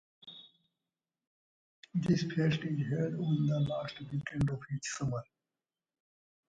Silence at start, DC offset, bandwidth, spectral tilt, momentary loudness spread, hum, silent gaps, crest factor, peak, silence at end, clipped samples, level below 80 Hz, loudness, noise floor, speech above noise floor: 0.25 s; under 0.1%; 9.2 kHz; -6.5 dB/octave; 12 LU; none; 1.27-1.83 s; 18 dB; -18 dBFS; 1.35 s; under 0.1%; -60 dBFS; -34 LUFS; under -90 dBFS; over 57 dB